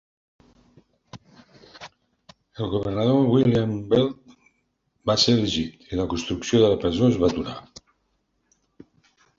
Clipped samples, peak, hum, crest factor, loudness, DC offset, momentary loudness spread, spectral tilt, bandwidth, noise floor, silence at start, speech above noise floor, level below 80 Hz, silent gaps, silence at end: under 0.1%; -4 dBFS; none; 20 dB; -22 LUFS; under 0.1%; 20 LU; -6 dB/octave; 7.6 kHz; -72 dBFS; 1.15 s; 50 dB; -48 dBFS; none; 1.8 s